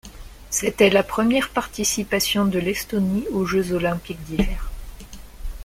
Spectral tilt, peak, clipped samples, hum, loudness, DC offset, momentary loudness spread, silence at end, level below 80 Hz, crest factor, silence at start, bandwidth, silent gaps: -4 dB/octave; -4 dBFS; under 0.1%; none; -21 LUFS; under 0.1%; 22 LU; 0 s; -36 dBFS; 20 dB; 0.05 s; 16.5 kHz; none